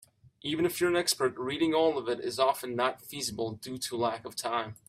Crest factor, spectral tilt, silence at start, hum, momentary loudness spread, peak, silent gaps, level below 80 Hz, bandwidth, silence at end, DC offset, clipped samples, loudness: 20 dB; -3.5 dB/octave; 0.45 s; none; 9 LU; -12 dBFS; none; -68 dBFS; 16 kHz; 0.15 s; under 0.1%; under 0.1%; -30 LUFS